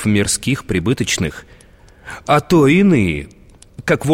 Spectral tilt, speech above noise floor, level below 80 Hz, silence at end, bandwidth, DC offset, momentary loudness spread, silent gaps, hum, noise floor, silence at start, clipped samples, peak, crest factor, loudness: -5 dB/octave; 29 dB; -40 dBFS; 0 s; 16.5 kHz; under 0.1%; 19 LU; none; none; -45 dBFS; 0 s; under 0.1%; -2 dBFS; 14 dB; -16 LUFS